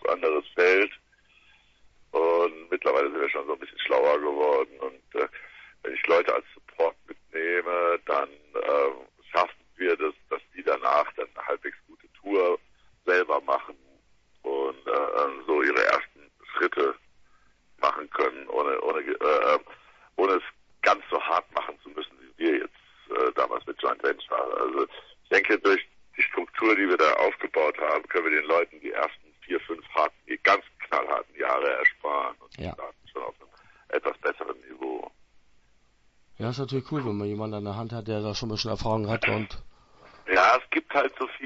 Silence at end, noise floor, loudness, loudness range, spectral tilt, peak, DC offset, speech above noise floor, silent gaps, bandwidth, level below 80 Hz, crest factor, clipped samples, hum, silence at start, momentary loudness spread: 0 s; -62 dBFS; -26 LUFS; 8 LU; -5.5 dB/octave; -6 dBFS; under 0.1%; 36 dB; none; 7.6 kHz; -58 dBFS; 22 dB; under 0.1%; none; 0.05 s; 15 LU